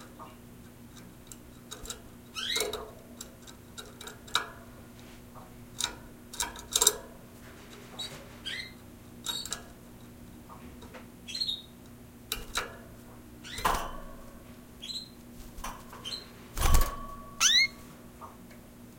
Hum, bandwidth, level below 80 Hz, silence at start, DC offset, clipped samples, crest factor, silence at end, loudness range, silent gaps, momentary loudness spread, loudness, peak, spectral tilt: 60 Hz at -55 dBFS; 17 kHz; -40 dBFS; 0 s; under 0.1%; under 0.1%; 32 dB; 0 s; 11 LU; none; 22 LU; -31 LUFS; -2 dBFS; -1.5 dB/octave